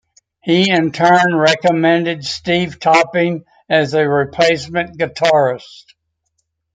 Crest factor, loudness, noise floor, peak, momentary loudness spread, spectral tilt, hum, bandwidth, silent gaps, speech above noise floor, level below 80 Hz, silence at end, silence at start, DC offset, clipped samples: 14 dB; -14 LUFS; -70 dBFS; 0 dBFS; 9 LU; -5 dB/octave; none; 9.4 kHz; none; 55 dB; -56 dBFS; 1.15 s; 0.45 s; under 0.1%; under 0.1%